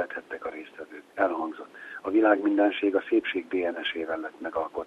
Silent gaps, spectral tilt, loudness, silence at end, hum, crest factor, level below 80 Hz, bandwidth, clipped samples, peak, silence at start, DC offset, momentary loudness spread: none; -5.5 dB/octave; -27 LUFS; 0 s; none; 20 dB; -68 dBFS; 5.2 kHz; under 0.1%; -6 dBFS; 0 s; under 0.1%; 18 LU